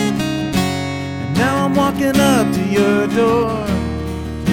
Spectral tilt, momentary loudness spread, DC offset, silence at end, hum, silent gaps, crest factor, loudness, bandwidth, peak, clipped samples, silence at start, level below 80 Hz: -5.5 dB/octave; 9 LU; under 0.1%; 0 s; none; none; 14 dB; -17 LUFS; 17 kHz; -2 dBFS; under 0.1%; 0 s; -34 dBFS